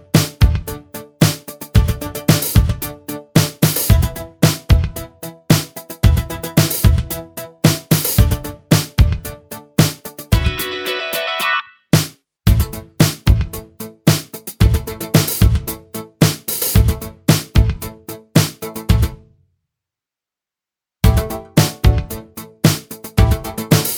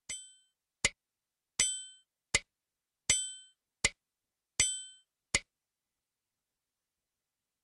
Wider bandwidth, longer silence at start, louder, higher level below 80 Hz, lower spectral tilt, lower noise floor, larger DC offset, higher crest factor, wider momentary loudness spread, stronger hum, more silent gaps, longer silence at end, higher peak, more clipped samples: first, over 20 kHz vs 11.5 kHz; about the same, 0.15 s vs 0.1 s; first, -17 LUFS vs -33 LUFS; first, -22 dBFS vs -58 dBFS; first, -5 dB/octave vs 0.5 dB/octave; about the same, -87 dBFS vs under -90 dBFS; neither; second, 16 dB vs 28 dB; about the same, 14 LU vs 13 LU; neither; neither; second, 0 s vs 2.2 s; first, 0 dBFS vs -12 dBFS; neither